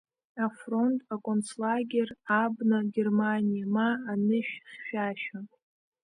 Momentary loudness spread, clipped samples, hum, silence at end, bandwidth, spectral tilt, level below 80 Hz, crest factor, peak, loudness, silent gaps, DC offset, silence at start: 10 LU; under 0.1%; none; 0.55 s; 10.5 kHz; -6.5 dB/octave; -78 dBFS; 16 dB; -14 dBFS; -29 LUFS; none; under 0.1%; 0.35 s